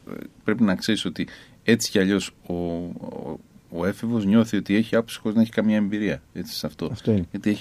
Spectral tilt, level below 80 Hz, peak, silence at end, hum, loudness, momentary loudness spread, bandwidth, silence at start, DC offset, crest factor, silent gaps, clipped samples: -5.5 dB/octave; -54 dBFS; -4 dBFS; 0 s; none; -24 LUFS; 13 LU; 15.5 kHz; 0.1 s; under 0.1%; 20 dB; none; under 0.1%